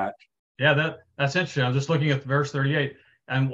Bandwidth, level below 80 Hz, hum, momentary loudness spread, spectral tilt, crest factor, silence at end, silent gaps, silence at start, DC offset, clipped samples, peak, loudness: 7.6 kHz; -64 dBFS; none; 8 LU; -6 dB/octave; 18 dB; 0 s; 0.39-0.55 s; 0 s; under 0.1%; under 0.1%; -6 dBFS; -25 LUFS